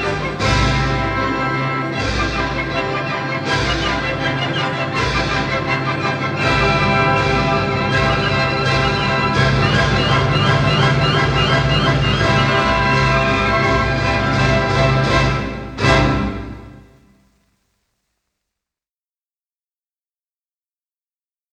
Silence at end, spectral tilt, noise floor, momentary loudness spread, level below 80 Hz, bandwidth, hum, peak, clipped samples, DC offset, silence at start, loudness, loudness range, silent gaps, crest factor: 4.75 s; -5.5 dB/octave; under -90 dBFS; 6 LU; -30 dBFS; 9.8 kHz; none; -2 dBFS; under 0.1%; under 0.1%; 0 s; -16 LUFS; 4 LU; none; 16 dB